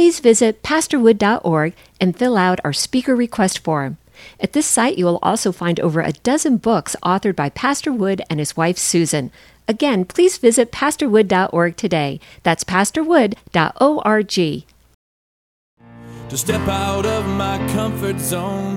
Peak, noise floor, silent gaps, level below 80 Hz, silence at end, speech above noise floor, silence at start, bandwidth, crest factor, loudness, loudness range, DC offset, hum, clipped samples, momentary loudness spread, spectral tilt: 0 dBFS; -36 dBFS; 14.94-15.77 s; -46 dBFS; 0 s; 19 dB; 0 s; 16.5 kHz; 18 dB; -17 LUFS; 5 LU; under 0.1%; none; under 0.1%; 8 LU; -4.5 dB/octave